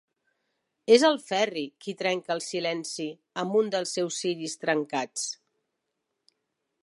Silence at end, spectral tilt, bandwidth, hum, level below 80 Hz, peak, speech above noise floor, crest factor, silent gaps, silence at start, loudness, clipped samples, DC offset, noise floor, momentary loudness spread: 1.5 s; -3 dB/octave; 11.5 kHz; none; -84 dBFS; -6 dBFS; 55 dB; 22 dB; none; 0.9 s; -27 LUFS; under 0.1%; under 0.1%; -82 dBFS; 14 LU